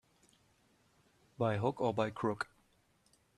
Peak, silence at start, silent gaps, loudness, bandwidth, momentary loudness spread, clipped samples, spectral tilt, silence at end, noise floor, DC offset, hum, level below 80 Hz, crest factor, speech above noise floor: -18 dBFS; 1.4 s; none; -36 LUFS; 12 kHz; 7 LU; under 0.1%; -7 dB/octave; 0.95 s; -72 dBFS; under 0.1%; none; -72 dBFS; 22 dB; 38 dB